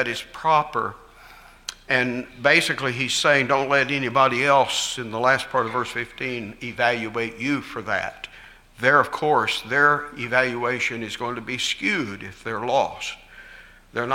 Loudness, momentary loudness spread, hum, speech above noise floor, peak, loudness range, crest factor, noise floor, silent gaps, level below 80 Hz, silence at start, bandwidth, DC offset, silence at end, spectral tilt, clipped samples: -22 LUFS; 14 LU; none; 25 dB; -2 dBFS; 6 LU; 22 dB; -47 dBFS; none; -54 dBFS; 0 s; 16.5 kHz; under 0.1%; 0 s; -3.5 dB/octave; under 0.1%